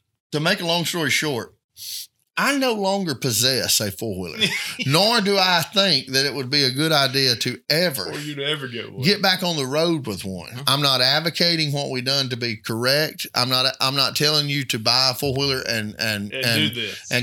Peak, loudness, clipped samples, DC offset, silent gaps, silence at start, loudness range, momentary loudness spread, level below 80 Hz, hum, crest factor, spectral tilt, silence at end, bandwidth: -2 dBFS; -20 LUFS; under 0.1%; under 0.1%; 1.64-1.69 s; 0.3 s; 3 LU; 10 LU; -60 dBFS; none; 20 dB; -3 dB/octave; 0 s; 18.5 kHz